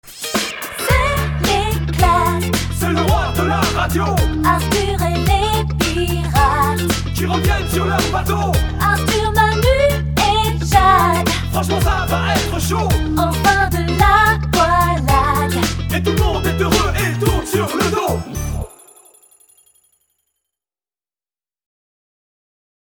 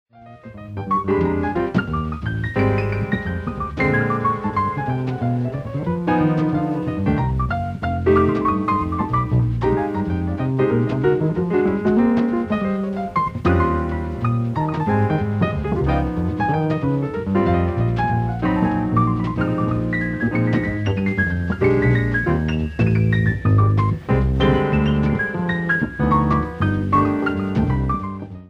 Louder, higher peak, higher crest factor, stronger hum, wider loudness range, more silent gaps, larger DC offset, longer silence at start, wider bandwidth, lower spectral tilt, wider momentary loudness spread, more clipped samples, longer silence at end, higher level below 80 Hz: first, -16 LUFS vs -20 LUFS; first, 0 dBFS vs -4 dBFS; about the same, 16 dB vs 14 dB; neither; about the same, 5 LU vs 3 LU; neither; neither; about the same, 0.05 s vs 0.15 s; first, over 20 kHz vs 6.8 kHz; second, -5 dB/octave vs -9 dB/octave; about the same, 5 LU vs 6 LU; neither; first, 4.25 s vs 0 s; first, -24 dBFS vs -32 dBFS